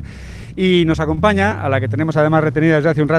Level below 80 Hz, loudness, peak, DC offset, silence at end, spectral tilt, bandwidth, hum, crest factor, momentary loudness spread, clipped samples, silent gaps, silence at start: -38 dBFS; -15 LUFS; -2 dBFS; under 0.1%; 0 s; -7.5 dB/octave; 10.5 kHz; none; 14 dB; 9 LU; under 0.1%; none; 0 s